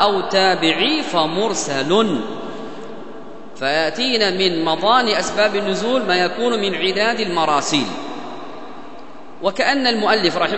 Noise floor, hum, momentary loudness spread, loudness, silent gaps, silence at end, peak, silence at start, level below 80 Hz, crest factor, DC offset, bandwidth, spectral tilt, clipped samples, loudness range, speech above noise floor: -38 dBFS; none; 18 LU; -17 LUFS; none; 0 s; 0 dBFS; 0 s; -58 dBFS; 20 dB; 2%; 8.4 kHz; -3.5 dB/octave; under 0.1%; 3 LU; 21 dB